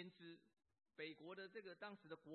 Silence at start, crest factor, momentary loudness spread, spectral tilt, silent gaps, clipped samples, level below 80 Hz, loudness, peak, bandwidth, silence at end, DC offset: 0 s; 18 dB; 10 LU; -3 dB/octave; none; under 0.1%; under -90 dBFS; -57 LUFS; -40 dBFS; 4.3 kHz; 0 s; under 0.1%